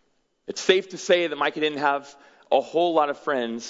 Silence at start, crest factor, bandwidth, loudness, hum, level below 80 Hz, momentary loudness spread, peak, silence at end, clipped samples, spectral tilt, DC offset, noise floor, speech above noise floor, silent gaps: 0.5 s; 20 dB; 7.8 kHz; -23 LUFS; none; -76 dBFS; 6 LU; -4 dBFS; 0 s; under 0.1%; -3 dB/octave; under 0.1%; -43 dBFS; 19 dB; none